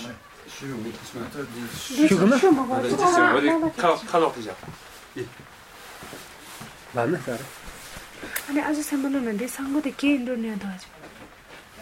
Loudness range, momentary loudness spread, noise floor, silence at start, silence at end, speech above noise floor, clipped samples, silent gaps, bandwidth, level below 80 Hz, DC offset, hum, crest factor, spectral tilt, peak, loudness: 12 LU; 24 LU; -47 dBFS; 0 s; 0 s; 23 dB; under 0.1%; none; 16.5 kHz; -56 dBFS; under 0.1%; none; 20 dB; -5 dB/octave; -4 dBFS; -23 LUFS